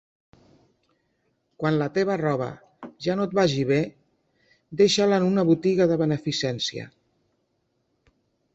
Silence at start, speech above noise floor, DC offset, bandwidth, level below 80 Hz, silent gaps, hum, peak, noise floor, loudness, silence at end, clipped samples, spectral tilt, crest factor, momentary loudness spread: 1.6 s; 50 dB; under 0.1%; 8.2 kHz; -62 dBFS; none; none; -8 dBFS; -73 dBFS; -23 LUFS; 1.7 s; under 0.1%; -5.5 dB/octave; 18 dB; 14 LU